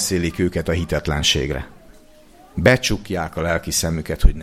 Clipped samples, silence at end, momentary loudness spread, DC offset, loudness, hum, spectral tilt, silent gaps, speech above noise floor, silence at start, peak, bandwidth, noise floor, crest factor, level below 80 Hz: under 0.1%; 0 s; 10 LU; under 0.1%; -20 LUFS; none; -4 dB/octave; none; 28 dB; 0 s; 0 dBFS; 16 kHz; -47 dBFS; 20 dB; -26 dBFS